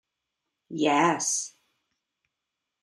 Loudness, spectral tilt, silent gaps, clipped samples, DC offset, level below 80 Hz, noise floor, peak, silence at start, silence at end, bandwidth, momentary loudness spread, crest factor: -25 LUFS; -3 dB/octave; none; under 0.1%; under 0.1%; -80 dBFS; -85 dBFS; -10 dBFS; 0.7 s; 1.35 s; 13 kHz; 17 LU; 20 dB